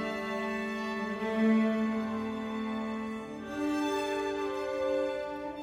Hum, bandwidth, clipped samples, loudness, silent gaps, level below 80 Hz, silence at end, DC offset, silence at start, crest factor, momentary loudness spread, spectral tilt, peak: none; 13 kHz; under 0.1%; -32 LUFS; none; -62 dBFS; 0 s; under 0.1%; 0 s; 16 dB; 9 LU; -5.5 dB/octave; -16 dBFS